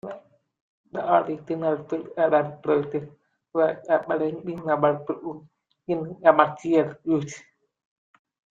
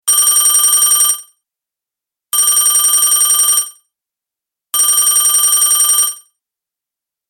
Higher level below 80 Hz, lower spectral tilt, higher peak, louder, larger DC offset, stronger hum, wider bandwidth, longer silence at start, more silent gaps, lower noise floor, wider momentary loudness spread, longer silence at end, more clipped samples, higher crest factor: second, -70 dBFS vs -58 dBFS; first, -7 dB/octave vs 4.5 dB/octave; about the same, -2 dBFS vs 0 dBFS; second, -24 LUFS vs -9 LUFS; neither; neither; second, 7.6 kHz vs 17 kHz; about the same, 0.05 s vs 0.05 s; first, 0.61-0.84 s vs none; second, -44 dBFS vs -85 dBFS; first, 16 LU vs 7 LU; about the same, 1.15 s vs 1.15 s; neither; first, 22 dB vs 14 dB